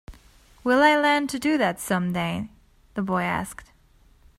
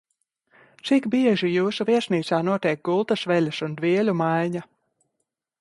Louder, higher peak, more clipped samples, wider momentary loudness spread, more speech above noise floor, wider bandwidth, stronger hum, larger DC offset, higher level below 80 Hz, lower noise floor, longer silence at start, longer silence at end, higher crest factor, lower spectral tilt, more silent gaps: about the same, -23 LUFS vs -23 LUFS; first, -4 dBFS vs -8 dBFS; neither; first, 18 LU vs 6 LU; second, 34 dB vs 57 dB; first, 16 kHz vs 11.5 kHz; neither; neither; first, -52 dBFS vs -70 dBFS; second, -57 dBFS vs -79 dBFS; second, 0.1 s vs 0.85 s; second, 0.75 s vs 0.95 s; about the same, 20 dB vs 16 dB; second, -5 dB/octave vs -6.5 dB/octave; neither